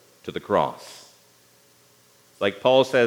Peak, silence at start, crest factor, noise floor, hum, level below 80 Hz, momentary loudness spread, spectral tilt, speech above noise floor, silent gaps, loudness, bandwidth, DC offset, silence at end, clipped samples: -4 dBFS; 0.25 s; 20 dB; -57 dBFS; 60 Hz at -65 dBFS; -68 dBFS; 23 LU; -5 dB/octave; 36 dB; none; -23 LUFS; 18 kHz; under 0.1%; 0 s; under 0.1%